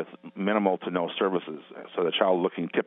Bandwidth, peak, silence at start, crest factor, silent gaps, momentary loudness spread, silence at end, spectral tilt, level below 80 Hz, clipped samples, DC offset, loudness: 4 kHz; -8 dBFS; 0 s; 20 dB; none; 14 LU; 0.05 s; -9.5 dB/octave; -80 dBFS; under 0.1%; under 0.1%; -27 LUFS